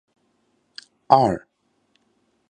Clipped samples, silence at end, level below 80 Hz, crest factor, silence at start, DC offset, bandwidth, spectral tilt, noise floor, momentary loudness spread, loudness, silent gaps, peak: under 0.1%; 1.15 s; -56 dBFS; 24 dB; 1.1 s; under 0.1%; 9.6 kHz; -7 dB/octave; -67 dBFS; 26 LU; -19 LUFS; none; 0 dBFS